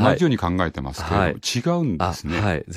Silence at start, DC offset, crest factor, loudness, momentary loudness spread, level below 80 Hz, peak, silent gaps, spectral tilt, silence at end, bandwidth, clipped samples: 0 s; under 0.1%; 18 dB; -22 LUFS; 5 LU; -40 dBFS; -4 dBFS; none; -5.5 dB/octave; 0 s; 15 kHz; under 0.1%